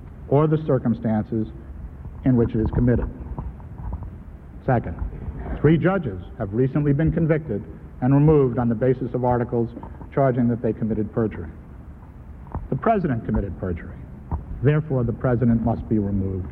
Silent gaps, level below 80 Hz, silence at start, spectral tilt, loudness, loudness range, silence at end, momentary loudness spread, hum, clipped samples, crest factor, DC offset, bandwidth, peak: none; -36 dBFS; 0 s; -12 dB/octave; -22 LUFS; 5 LU; 0 s; 18 LU; none; under 0.1%; 18 dB; under 0.1%; 4 kHz; -4 dBFS